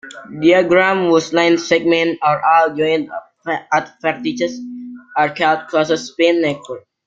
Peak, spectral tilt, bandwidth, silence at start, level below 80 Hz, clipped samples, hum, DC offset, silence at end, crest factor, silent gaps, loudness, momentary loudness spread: -2 dBFS; -4.5 dB/octave; 7.6 kHz; 0.05 s; -60 dBFS; under 0.1%; none; under 0.1%; 0.3 s; 14 dB; none; -16 LUFS; 15 LU